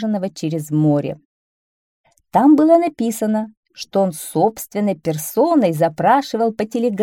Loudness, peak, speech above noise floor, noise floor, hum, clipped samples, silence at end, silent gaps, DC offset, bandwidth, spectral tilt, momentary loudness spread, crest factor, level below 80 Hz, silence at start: -17 LUFS; -2 dBFS; over 73 dB; under -90 dBFS; none; under 0.1%; 0 s; 1.25-2.04 s, 3.57-3.63 s; under 0.1%; 18 kHz; -6.5 dB/octave; 10 LU; 16 dB; -62 dBFS; 0 s